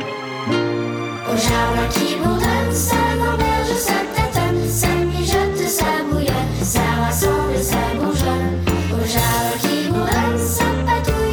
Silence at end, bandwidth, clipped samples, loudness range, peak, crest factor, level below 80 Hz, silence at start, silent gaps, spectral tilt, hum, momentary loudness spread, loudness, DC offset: 0 s; over 20 kHz; under 0.1%; 1 LU; -4 dBFS; 14 dB; -28 dBFS; 0 s; none; -4.5 dB/octave; none; 3 LU; -18 LUFS; under 0.1%